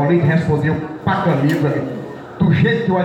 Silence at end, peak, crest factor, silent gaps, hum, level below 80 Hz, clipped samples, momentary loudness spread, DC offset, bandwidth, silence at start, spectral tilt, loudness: 0 s; -4 dBFS; 12 dB; none; none; -46 dBFS; under 0.1%; 10 LU; under 0.1%; 9 kHz; 0 s; -8.5 dB/octave; -17 LUFS